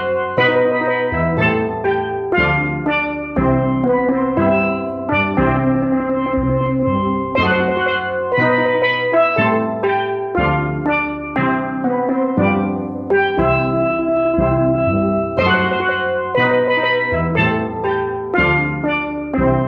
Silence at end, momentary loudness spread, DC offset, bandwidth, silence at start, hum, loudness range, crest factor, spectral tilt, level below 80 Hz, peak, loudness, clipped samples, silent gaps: 0 s; 5 LU; under 0.1%; 5.6 kHz; 0 s; none; 1 LU; 16 dB; -9 dB/octave; -36 dBFS; -2 dBFS; -17 LUFS; under 0.1%; none